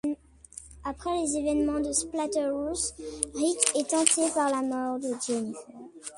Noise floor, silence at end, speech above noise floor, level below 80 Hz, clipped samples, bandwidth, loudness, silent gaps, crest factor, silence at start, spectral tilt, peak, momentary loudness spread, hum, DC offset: -49 dBFS; 0 s; 21 dB; -54 dBFS; under 0.1%; 11.5 kHz; -27 LUFS; none; 28 dB; 0.05 s; -2.5 dB/octave; 0 dBFS; 17 LU; none; under 0.1%